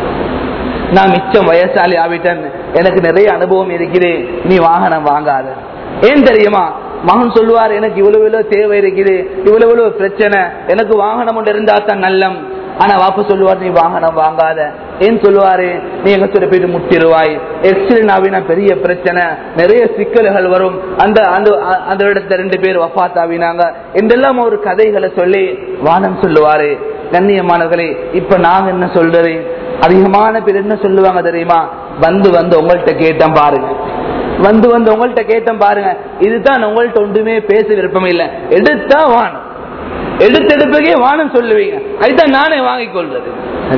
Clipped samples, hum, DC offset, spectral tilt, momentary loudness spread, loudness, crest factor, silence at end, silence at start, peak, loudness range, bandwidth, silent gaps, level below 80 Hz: 2%; none; under 0.1%; -8 dB/octave; 8 LU; -10 LUFS; 10 dB; 0 s; 0 s; 0 dBFS; 2 LU; 5.4 kHz; none; -38 dBFS